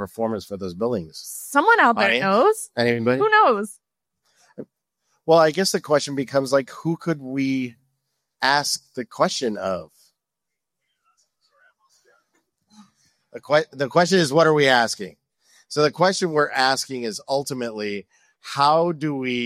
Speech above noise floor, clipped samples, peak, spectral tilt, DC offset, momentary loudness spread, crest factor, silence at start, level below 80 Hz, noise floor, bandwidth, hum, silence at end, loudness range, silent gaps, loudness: 63 dB; under 0.1%; -4 dBFS; -4 dB/octave; under 0.1%; 15 LU; 18 dB; 0 s; -66 dBFS; -84 dBFS; 15.5 kHz; none; 0 s; 9 LU; none; -20 LUFS